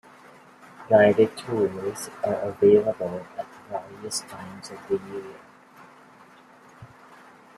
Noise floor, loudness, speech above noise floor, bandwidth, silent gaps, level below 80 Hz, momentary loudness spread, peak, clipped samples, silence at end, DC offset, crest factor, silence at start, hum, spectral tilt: -52 dBFS; -24 LUFS; 28 dB; 14 kHz; none; -66 dBFS; 21 LU; -4 dBFS; under 0.1%; 0.75 s; under 0.1%; 22 dB; 0.8 s; none; -5 dB/octave